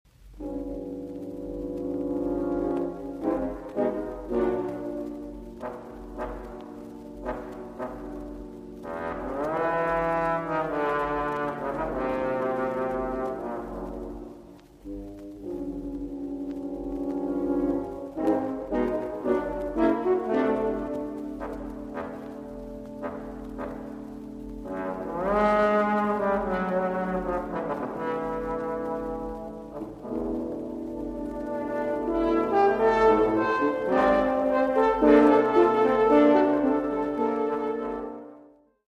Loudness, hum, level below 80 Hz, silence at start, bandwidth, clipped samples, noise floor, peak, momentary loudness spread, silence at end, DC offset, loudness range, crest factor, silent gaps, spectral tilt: -27 LUFS; none; -48 dBFS; 0.25 s; 10.5 kHz; under 0.1%; -54 dBFS; -6 dBFS; 18 LU; 0.45 s; under 0.1%; 15 LU; 20 dB; none; -7.5 dB/octave